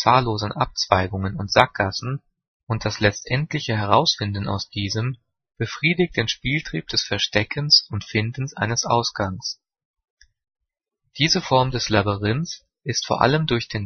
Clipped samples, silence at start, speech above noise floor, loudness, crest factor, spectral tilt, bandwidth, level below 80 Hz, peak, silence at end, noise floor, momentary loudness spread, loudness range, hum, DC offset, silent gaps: under 0.1%; 0 s; 55 dB; -21 LUFS; 22 dB; -4.5 dB/octave; 6.6 kHz; -48 dBFS; 0 dBFS; 0 s; -77 dBFS; 11 LU; 3 LU; none; under 0.1%; 2.47-2.67 s, 9.85-9.94 s, 10.10-10.17 s